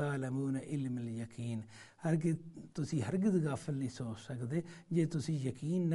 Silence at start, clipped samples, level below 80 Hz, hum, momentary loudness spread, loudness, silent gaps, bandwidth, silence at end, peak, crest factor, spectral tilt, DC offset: 0 s; under 0.1%; -70 dBFS; none; 9 LU; -37 LUFS; none; 11.5 kHz; 0 s; -20 dBFS; 16 dB; -7.5 dB/octave; under 0.1%